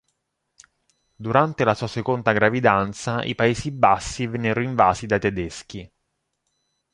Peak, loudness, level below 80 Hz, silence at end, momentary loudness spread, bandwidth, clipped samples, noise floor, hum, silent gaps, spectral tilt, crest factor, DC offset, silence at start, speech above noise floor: -2 dBFS; -21 LUFS; -48 dBFS; 1.05 s; 12 LU; 11.5 kHz; under 0.1%; -76 dBFS; none; none; -5.5 dB/octave; 22 dB; under 0.1%; 1.2 s; 54 dB